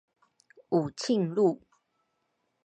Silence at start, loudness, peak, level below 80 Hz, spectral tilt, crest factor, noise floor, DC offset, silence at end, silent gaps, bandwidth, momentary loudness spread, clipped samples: 0.7 s; -28 LUFS; -12 dBFS; -76 dBFS; -6.5 dB/octave; 18 dB; -78 dBFS; under 0.1%; 1.1 s; none; 9.2 kHz; 4 LU; under 0.1%